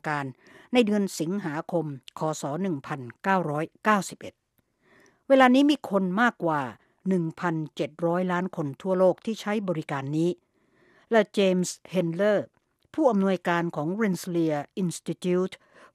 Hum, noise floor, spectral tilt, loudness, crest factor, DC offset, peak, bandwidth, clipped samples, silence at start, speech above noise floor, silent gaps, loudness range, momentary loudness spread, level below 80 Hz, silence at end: none; -69 dBFS; -6 dB/octave; -26 LUFS; 22 dB; under 0.1%; -6 dBFS; 14.5 kHz; under 0.1%; 0.05 s; 44 dB; none; 4 LU; 9 LU; -74 dBFS; 0.4 s